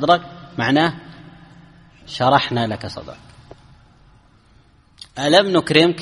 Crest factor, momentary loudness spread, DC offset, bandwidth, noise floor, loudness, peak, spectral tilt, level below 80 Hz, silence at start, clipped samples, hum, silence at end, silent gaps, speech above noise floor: 20 dB; 20 LU; under 0.1%; 11.5 kHz; -52 dBFS; -17 LUFS; 0 dBFS; -5 dB/octave; -52 dBFS; 0 s; under 0.1%; none; 0 s; none; 35 dB